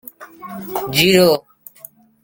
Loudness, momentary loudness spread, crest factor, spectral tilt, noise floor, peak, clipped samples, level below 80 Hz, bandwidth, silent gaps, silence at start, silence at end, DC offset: -15 LUFS; 24 LU; 18 dB; -4 dB/octave; -43 dBFS; 0 dBFS; under 0.1%; -52 dBFS; 17 kHz; none; 0.2 s; 0.85 s; under 0.1%